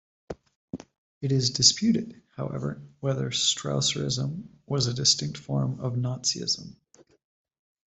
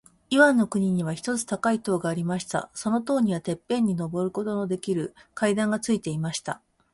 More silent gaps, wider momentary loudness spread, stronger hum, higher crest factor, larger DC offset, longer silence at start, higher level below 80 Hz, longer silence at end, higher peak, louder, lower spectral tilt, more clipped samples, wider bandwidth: first, 0.56-0.68 s, 0.98-1.21 s vs none; first, 22 LU vs 9 LU; neither; first, 26 dB vs 20 dB; neither; about the same, 0.3 s vs 0.3 s; about the same, -60 dBFS vs -62 dBFS; first, 1.2 s vs 0.35 s; about the same, -4 dBFS vs -4 dBFS; about the same, -26 LUFS vs -26 LUFS; second, -3.5 dB/octave vs -5.5 dB/octave; neither; second, 8.4 kHz vs 11.5 kHz